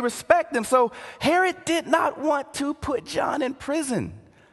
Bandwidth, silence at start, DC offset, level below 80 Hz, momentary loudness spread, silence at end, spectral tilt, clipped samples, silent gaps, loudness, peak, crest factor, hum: 12.5 kHz; 0 s; under 0.1%; -52 dBFS; 7 LU; 0.35 s; -4 dB/octave; under 0.1%; none; -24 LUFS; -2 dBFS; 22 dB; none